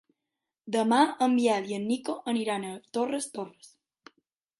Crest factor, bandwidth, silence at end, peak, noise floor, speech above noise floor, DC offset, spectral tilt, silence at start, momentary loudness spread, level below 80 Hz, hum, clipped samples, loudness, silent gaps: 20 dB; 11.5 kHz; 1.1 s; -8 dBFS; -87 dBFS; 59 dB; under 0.1%; -4.5 dB/octave; 0.65 s; 11 LU; -80 dBFS; none; under 0.1%; -28 LUFS; none